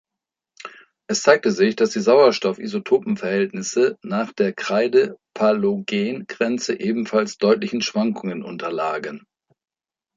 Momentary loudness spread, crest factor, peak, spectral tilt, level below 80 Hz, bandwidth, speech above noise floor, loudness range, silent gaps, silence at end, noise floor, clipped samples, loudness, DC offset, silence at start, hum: 12 LU; 20 dB; -2 dBFS; -4.5 dB/octave; -68 dBFS; 7.8 kHz; 66 dB; 4 LU; none; 1 s; -86 dBFS; under 0.1%; -20 LUFS; under 0.1%; 0.65 s; none